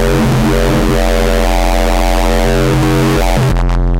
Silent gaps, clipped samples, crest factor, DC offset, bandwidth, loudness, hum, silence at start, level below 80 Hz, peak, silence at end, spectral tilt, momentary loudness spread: none; under 0.1%; 6 dB; under 0.1%; 16 kHz; -12 LUFS; none; 0 s; -14 dBFS; -4 dBFS; 0 s; -5.5 dB/octave; 2 LU